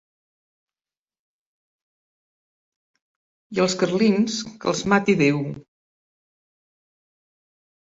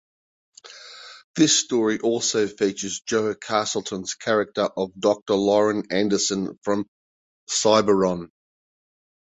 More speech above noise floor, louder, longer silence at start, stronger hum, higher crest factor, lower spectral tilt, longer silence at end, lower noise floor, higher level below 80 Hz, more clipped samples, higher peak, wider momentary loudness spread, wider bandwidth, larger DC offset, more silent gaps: first, over 69 dB vs 22 dB; about the same, -21 LUFS vs -22 LUFS; first, 3.5 s vs 0.65 s; neither; about the same, 20 dB vs 20 dB; first, -5 dB/octave vs -3.5 dB/octave; first, 2.3 s vs 1 s; first, under -90 dBFS vs -44 dBFS; about the same, -62 dBFS vs -62 dBFS; neither; about the same, -6 dBFS vs -4 dBFS; second, 10 LU vs 14 LU; about the same, 8 kHz vs 8.4 kHz; neither; second, none vs 1.24-1.34 s, 5.22-5.26 s, 6.88-7.47 s